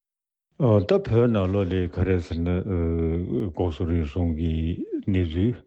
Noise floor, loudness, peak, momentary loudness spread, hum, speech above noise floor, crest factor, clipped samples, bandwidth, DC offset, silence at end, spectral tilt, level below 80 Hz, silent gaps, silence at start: -89 dBFS; -24 LUFS; -8 dBFS; 6 LU; none; 66 dB; 16 dB; under 0.1%; 7.4 kHz; under 0.1%; 0.05 s; -9.5 dB/octave; -40 dBFS; none; 0.6 s